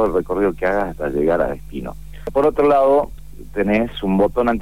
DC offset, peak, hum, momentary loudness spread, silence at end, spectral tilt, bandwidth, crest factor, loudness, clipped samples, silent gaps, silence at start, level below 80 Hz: 2%; -4 dBFS; none; 15 LU; 0 s; -7.5 dB/octave; 16 kHz; 14 dB; -18 LUFS; under 0.1%; none; 0 s; -36 dBFS